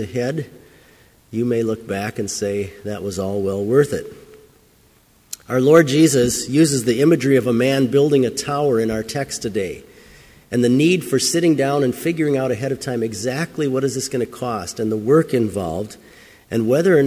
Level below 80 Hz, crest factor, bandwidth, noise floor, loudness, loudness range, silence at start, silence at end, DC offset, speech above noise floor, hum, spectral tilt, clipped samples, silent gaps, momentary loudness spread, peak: -50 dBFS; 18 dB; 16 kHz; -54 dBFS; -19 LUFS; 7 LU; 0 s; 0 s; under 0.1%; 36 dB; none; -5.5 dB/octave; under 0.1%; none; 11 LU; 0 dBFS